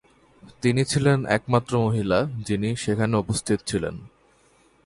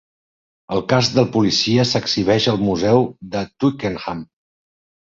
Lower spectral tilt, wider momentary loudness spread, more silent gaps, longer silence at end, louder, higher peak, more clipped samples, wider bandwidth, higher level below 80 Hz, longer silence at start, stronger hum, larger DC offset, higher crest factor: about the same, -5.5 dB/octave vs -5.5 dB/octave; second, 6 LU vs 11 LU; neither; about the same, 0.8 s vs 0.8 s; second, -24 LUFS vs -18 LUFS; second, -6 dBFS vs -2 dBFS; neither; first, 11.5 kHz vs 7.8 kHz; about the same, -50 dBFS vs -48 dBFS; second, 0.45 s vs 0.7 s; neither; neither; about the same, 18 dB vs 18 dB